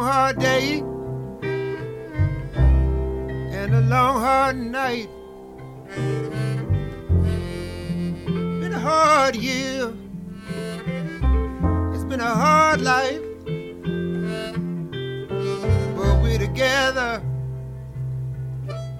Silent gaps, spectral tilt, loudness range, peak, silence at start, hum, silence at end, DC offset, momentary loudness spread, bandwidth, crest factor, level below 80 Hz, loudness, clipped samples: none; -6 dB/octave; 4 LU; -4 dBFS; 0 s; none; 0 s; under 0.1%; 13 LU; 14.5 kHz; 18 dB; -30 dBFS; -22 LUFS; under 0.1%